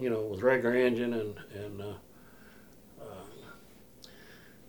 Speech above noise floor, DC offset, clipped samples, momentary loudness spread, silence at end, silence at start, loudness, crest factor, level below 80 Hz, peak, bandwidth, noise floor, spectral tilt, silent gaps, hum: 26 dB; under 0.1%; under 0.1%; 26 LU; 0.2 s; 0 s; -31 LUFS; 20 dB; -66 dBFS; -14 dBFS; over 20 kHz; -56 dBFS; -6.5 dB/octave; none; none